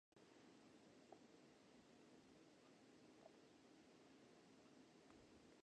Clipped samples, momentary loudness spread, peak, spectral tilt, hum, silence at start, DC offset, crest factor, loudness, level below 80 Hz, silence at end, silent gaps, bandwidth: under 0.1%; 2 LU; -48 dBFS; -4.5 dB/octave; none; 0.15 s; under 0.1%; 22 dB; -69 LUFS; under -90 dBFS; 0.05 s; none; 9.4 kHz